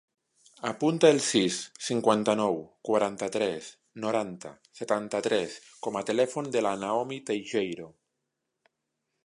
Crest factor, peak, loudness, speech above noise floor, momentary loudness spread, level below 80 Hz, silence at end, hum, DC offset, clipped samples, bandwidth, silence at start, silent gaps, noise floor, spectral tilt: 22 dB; -8 dBFS; -28 LUFS; 55 dB; 14 LU; -72 dBFS; 1.35 s; none; under 0.1%; under 0.1%; 11.5 kHz; 0.65 s; none; -83 dBFS; -4 dB/octave